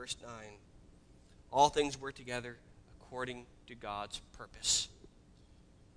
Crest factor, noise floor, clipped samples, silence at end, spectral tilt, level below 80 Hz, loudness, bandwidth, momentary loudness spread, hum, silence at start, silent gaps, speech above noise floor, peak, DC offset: 26 dB; -61 dBFS; under 0.1%; 0.85 s; -2 dB/octave; -60 dBFS; -35 LUFS; 11 kHz; 22 LU; none; 0 s; none; 25 dB; -12 dBFS; under 0.1%